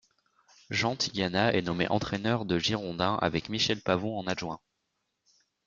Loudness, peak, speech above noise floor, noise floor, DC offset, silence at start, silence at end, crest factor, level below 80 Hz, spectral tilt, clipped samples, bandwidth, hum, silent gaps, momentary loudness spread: -29 LUFS; -10 dBFS; 51 dB; -81 dBFS; under 0.1%; 0.7 s; 1.1 s; 22 dB; -58 dBFS; -4.5 dB/octave; under 0.1%; 7.6 kHz; none; none; 7 LU